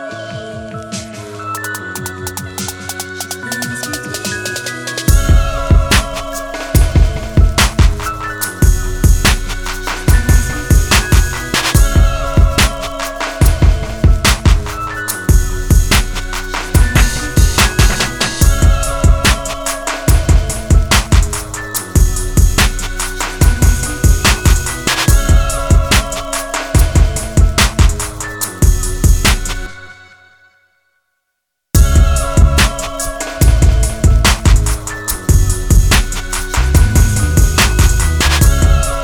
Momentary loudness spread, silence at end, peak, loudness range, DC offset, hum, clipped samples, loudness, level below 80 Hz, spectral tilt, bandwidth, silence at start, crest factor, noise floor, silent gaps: 11 LU; 0 s; 0 dBFS; 5 LU; under 0.1%; none; under 0.1%; -14 LUFS; -14 dBFS; -4 dB/octave; 19 kHz; 0 s; 12 dB; -72 dBFS; none